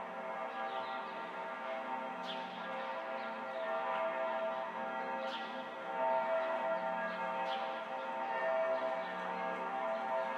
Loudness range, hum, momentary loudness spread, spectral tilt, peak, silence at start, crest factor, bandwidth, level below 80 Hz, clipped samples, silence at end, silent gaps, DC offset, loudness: 4 LU; none; 7 LU; -4.5 dB/octave; -24 dBFS; 0 s; 14 dB; 10 kHz; under -90 dBFS; under 0.1%; 0 s; none; under 0.1%; -38 LUFS